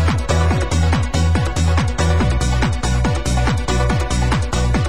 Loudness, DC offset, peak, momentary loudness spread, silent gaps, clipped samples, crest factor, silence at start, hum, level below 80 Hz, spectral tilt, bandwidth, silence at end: -18 LUFS; 3%; -2 dBFS; 2 LU; none; under 0.1%; 14 dB; 0 s; none; -20 dBFS; -5.5 dB/octave; 12.5 kHz; 0 s